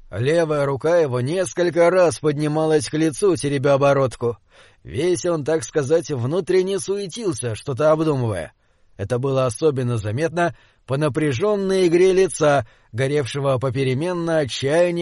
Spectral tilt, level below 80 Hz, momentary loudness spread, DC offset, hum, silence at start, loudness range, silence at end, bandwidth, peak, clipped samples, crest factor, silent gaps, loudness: -6 dB/octave; -52 dBFS; 9 LU; under 0.1%; none; 0.1 s; 3 LU; 0 s; 11.5 kHz; -6 dBFS; under 0.1%; 14 dB; none; -20 LUFS